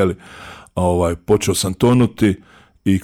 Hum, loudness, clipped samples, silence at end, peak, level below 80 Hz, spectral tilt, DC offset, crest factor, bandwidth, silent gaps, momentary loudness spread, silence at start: none; -17 LUFS; under 0.1%; 0 s; -2 dBFS; -40 dBFS; -6 dB/octave; under 0.1%; 14 dB; 17 kHz; none; 16 LU; 0 s